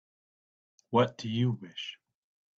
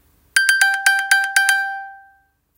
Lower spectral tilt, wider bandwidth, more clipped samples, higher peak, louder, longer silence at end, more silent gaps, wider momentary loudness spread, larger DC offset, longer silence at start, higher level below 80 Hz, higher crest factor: first, -7 dB/octave vs 5 dB/octave; second, 7.6 kHz vs 17 kHz; neither; second, -12 dBFS vs 0 dBFS; second, -31 LUFS vs -15 LUFS; about the same, 0.65 s vs 0.6 s; neither; first, 13 LU vs 8 LU; neither; first, 0.9 s vs 0.35 s; about the same, -70 dBFS vs -68 dBFS; about the same, 22 dB vs 18 dB